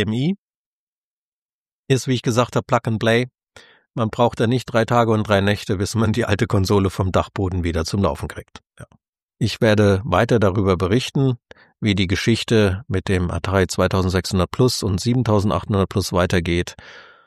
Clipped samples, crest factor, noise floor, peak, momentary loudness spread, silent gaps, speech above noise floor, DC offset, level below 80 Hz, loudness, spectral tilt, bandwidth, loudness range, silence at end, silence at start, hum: under 0.1%; 18 dB; under -90 dBFS; -2 dBFS; 7 LU; 0.38-1.66 s, 1.72-1.84 s, 9.08-9.13 s, 9.22-9.29 s; over 71 dB; under 0.1%; -42 dBFS; -19 LUFS; -6 dB/octave; 14 kHz; 3 LU; 0.25 s; 0 s; none